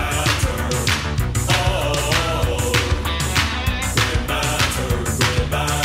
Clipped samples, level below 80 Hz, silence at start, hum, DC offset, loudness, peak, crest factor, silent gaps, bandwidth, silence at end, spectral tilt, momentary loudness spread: under 0.1%; -26 dBFS; 0 s; none; under 0.1%; -19 LUFS; -2 dBFS; 16 dB; none; 16.5 kHz; 0 s; -3.5 dB/octave; 3 LU